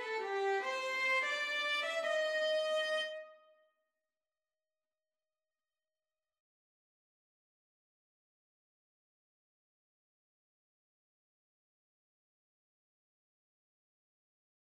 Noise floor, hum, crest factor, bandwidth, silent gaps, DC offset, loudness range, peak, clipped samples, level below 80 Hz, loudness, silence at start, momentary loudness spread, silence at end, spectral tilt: under -90 dBFS; none; 18 dB; 14 kHz; none; under 0.1%; 9 LU; -24 dBFS; under 0.1%; under -90 dBFS; -34 LUFS; 0 s; 5 LU; 11.35 s; 1.5 dB/octave